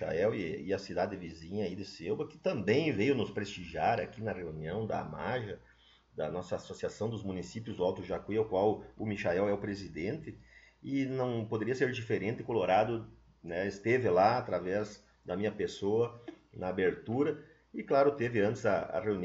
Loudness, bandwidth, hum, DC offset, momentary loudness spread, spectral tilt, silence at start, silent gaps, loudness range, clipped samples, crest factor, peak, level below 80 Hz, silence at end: -34 LUFS; 7.8 kHz; none; under 0.1%; 12 LU; -5.5 dB/octave; 0 s; none; 6 LU; under 0.1%; 20 dB; -14 dBFS; -62 dBFS; 0 s